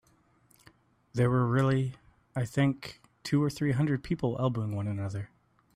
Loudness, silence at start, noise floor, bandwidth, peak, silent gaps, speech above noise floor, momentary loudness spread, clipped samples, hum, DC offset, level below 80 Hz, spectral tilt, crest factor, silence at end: -30 LUFS; 1.15 s; -65 dBFS; 13 kHz; -14 dBFS; none; 37 dB; 13 LU; under 0.1%; none; under 0.1%; -58 dBFS; -7.5 dB/octave; 16 dB; 0.5 s